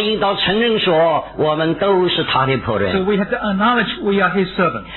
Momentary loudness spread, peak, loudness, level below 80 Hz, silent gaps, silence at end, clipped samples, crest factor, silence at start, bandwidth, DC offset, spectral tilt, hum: 4 LU; -4 dBFS; -16 LUFS; -44 dBFS; none; 0 s; under 0.1%; 14 dB; 0 s; 4.3 kHz; under 0.1%; -8.5 dB/octave; none